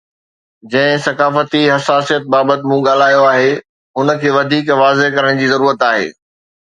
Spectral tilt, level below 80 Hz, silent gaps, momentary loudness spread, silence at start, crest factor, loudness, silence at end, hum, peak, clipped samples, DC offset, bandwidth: -5 dB/octave; -60 dBFS; 3.69-3.94 s; 6 LU; 0.65 s; 14 dB; -12 LUFS; 0.55 s; none; 0 dBFS; under 0.1%; under 0.1%; 9.4 kHz